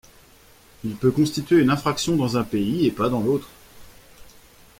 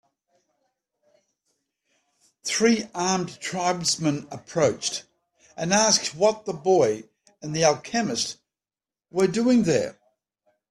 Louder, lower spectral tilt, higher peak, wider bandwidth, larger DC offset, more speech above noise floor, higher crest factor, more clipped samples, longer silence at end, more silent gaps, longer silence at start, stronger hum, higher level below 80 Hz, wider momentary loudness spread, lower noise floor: about the same, -22 LUFS vs -23 LUFS; first, -6 dB/octave vs -3.5 dB/octave; about the same, -6 dBFS vs -6 dBFS; first, 16.5 kHz vs 13.5 kHz; neither; second, 31 dB vs over 67 dB; about the same, 16 dB vs 20 dB; neither; second, 0.55 s vs 0.8 s; neither; second, 0.85 s vs 2.45 s; neither; first, -52 dBFS vs -64 dBFS; second, 7 LU vs 13 LU; second, -52 dBFS vs under -90 dBFS